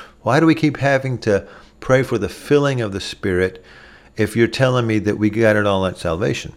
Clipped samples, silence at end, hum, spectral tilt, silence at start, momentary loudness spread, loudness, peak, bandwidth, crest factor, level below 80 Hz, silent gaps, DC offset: under 0.1%; 0.05 s; none; -6.5 dB/octave; 0 s; 8 LU; -18 LUFS; -2 dBFS; 15 kHz; 16 dB; -46 dBFS; none; under 0.1%